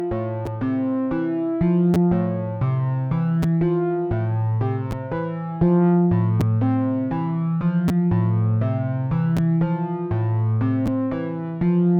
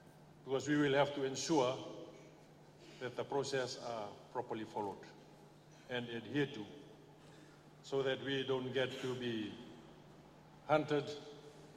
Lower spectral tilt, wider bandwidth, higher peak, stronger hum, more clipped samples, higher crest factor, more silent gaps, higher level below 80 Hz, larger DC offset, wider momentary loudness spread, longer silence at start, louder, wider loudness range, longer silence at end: first, -10.5 dB/octave vs -5 dB/octave; second, 5.2 kHz vs 14.5 kHz; first, -8 dBFS vs -18 dBFS; neither; neither; second, 12 dB vs 22 dB; neither; first, -44 dBFS vs -76 dBFS; neither; second, 7 LU vs 25 LU; about the same, 0 s vs 0 s; first, -22 LUFS vs -39 LUFS; second, 2 LU vs 6 LU; about the same, 0 s vs 0 s